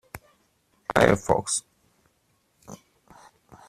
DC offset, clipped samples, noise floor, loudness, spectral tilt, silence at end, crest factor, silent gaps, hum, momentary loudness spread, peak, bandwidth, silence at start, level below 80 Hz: under 0.1%; under 0.1%; -69 dBFS; -23 LUFS; -4 dB/octave; 0.95 s; 28 dB; none; none; 26 LU; -2 dBFS; 15.5 kHz; 0.15 s; -52 dBFS